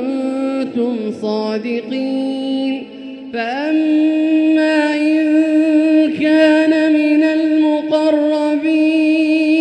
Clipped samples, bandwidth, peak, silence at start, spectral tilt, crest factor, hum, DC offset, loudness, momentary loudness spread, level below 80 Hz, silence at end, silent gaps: under 0.1%; 9 kHz; -2 dBFS; 0 s; -5.5 dB/octave; 14 dB; none; under 0.1%; -15 LUFS; 8 LU; -64 dBFS; 0 s; none